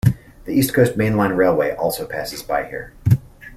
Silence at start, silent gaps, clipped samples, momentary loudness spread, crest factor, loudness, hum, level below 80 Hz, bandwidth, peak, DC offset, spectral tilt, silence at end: 0.05 s; none; under 0.1%; 10 LU; 18 dB; -19 LUFS; none; -42 dBFS; 15.5 kHz; -2 dBFS; under 0.1%; -6.5 dB/octave; 0 s